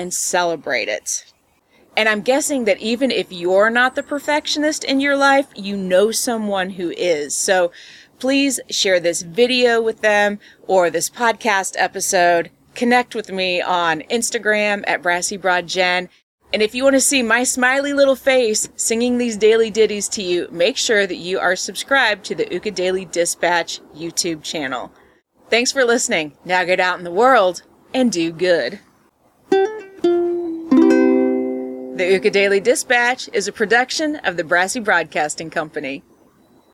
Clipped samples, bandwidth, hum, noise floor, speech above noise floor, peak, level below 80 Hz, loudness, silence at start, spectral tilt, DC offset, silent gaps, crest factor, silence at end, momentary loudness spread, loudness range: under 0.1%; 16 kHz; none; -57 dBFS; 39 dB; -2 dBFS; -60 dBFS; -17 LUFS; 0 s; -2.5 dB/octave; under 0.1%; 16.23-16.38 s; 16 dB; 0.75 s; 9 LU; 3 LU